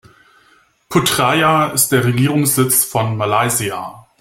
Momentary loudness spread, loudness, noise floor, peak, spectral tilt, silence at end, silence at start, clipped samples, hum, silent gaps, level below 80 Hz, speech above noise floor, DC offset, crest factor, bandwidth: 6 LU; -14 LUFS; -53 dBFS; 0 dBFS; -4 dB/octave; 0.2 s; 0.9 s; under 0.1%; none; none; -50 dBFS; 38 dB; under 0.1%; 16 dB; 16.5 kHz